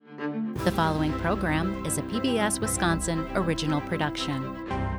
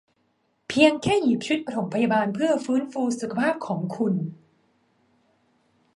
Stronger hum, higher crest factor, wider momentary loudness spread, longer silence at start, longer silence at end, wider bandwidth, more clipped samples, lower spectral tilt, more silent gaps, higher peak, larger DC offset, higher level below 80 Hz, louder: neither; second, 16 dB vs 22 dB; second, 6 LU vs 10 LU; second, 0.05 s vs 0.7 s; second, 0 s vs 1.65 s; first, over 20 kHz vs 11.5 kHz; neither; about the same, -4.5 dB/octave vs -5.5 dB/octave; neither; second, -10 dBFS vs -2 dBFS; neither; first, -42 dBFS vs -62 dBFS; second, -27 LUFS vs -24 LUFS